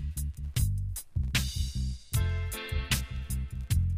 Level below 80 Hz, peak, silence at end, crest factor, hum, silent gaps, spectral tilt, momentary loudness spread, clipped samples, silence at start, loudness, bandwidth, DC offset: -34 dBFS; -14 dBFS; 0 s; 16 dB; none; none; -4 dB/octave; 6 LU; under 0.1%; 0 s; -33 LUFS; 15.5 kHz; under 0.1%